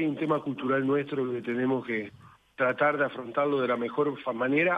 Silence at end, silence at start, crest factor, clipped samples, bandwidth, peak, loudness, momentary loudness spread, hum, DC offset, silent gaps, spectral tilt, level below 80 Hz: 0 s; 0 s; 16 dB; under 0.1%; 5.6 kHz; -12 dBFS; -28 LUFS; 6 LU; none; under 0.1%; none; -8 dB/octave; -72 dBFS